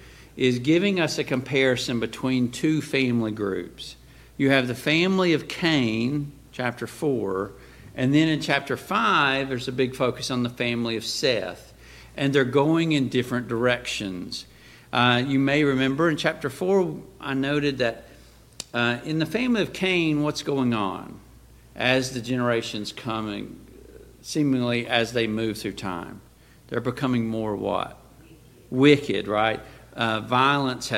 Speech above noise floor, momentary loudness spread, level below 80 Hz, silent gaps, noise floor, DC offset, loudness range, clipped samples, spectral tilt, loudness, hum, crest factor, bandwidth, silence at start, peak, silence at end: 26 dB; 12 LU; -54 dBFS; none; -50 dBFS; under 0.1%; 4 LU; under 0.1%; -5.5 dB/octave; -24 LUFS; none; 22 dB; 16 kHz; 0 s; -4 dBFS; 0 s